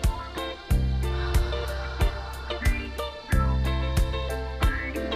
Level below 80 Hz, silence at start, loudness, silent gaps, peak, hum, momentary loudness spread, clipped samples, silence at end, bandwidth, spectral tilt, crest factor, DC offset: -28 dBFS; 0 s; -28 LUFS; none; -10 dBFS; none; 7 LU; under 0.1%; 0 s; 15.5 kHz; -5.5 dB/octave; 16 dB; under 0.1%